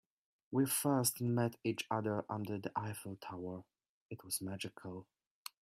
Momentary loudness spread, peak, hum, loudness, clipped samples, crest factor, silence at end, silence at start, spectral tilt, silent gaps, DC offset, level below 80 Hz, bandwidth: 18 LU; -20 dBFS; none; -38 LUFS; under 0.1%; 20 dB; 0.6 s; 0.5 s; -4.5 dB/octave; 3.89-4.09 s; under 0.1%; -78 dBFS; 16 kHz